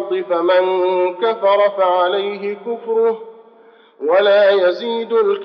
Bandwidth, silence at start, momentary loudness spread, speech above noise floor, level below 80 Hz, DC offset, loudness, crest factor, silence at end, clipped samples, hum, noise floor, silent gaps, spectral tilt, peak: 5.8 kHz; 0 s; 11 LU; 32 dB; under -90 dBFS; under 0.1%; -16 LUFS; 12 dB; 0 s; under 0.1%; none; -47 dBFS; none; -1.5 dB/octave; -4 dBFS